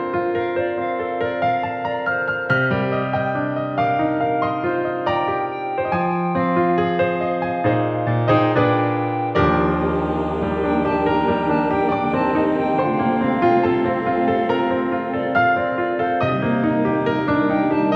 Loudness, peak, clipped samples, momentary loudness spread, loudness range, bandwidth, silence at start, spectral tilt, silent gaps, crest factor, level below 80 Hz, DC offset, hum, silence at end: -20 LUFS; -2 dBFS; under 0.1%; 5 LU; 2 LU; 6.2 kHz; 0 s; -9 dB/octave; none; 16 dB; -44 dBFS; under 0.1%; none; 0 s